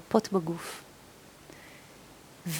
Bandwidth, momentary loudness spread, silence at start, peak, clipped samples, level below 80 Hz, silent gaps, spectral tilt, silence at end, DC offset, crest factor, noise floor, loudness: over 20 kHz; 24 LU; 0 s; -8 dBFS; under 0.1%; -66 dBFS; none; -5.5 dB/octave; 0 s; under 0.1%; 26 dB; -53 dBFS; -32 LUFS